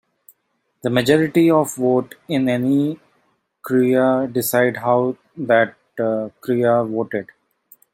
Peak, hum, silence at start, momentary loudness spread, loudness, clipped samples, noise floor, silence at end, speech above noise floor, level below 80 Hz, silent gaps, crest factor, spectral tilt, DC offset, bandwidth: -2 dBFS; none; 0.85 s; 9 LU; -19 LUFS; under 0.1%; -70 dBFS; 0.7 s; 52 dB; -62 dBFS; none; 18 dB; -6 dB/octave; under 0.1%; 16.5 kHz